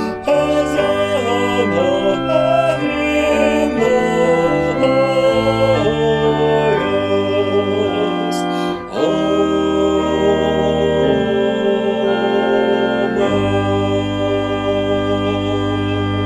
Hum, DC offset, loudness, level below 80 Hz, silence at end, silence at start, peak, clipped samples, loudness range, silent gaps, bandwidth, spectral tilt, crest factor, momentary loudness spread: none; under 0.1%; -16 LUFS; -40 dBFS; 0 s; 0 s; -2 dBFS; under 0.1%; 2 LU; none; 13 kHz; -6 dB/octave; 14 dB; 4 LU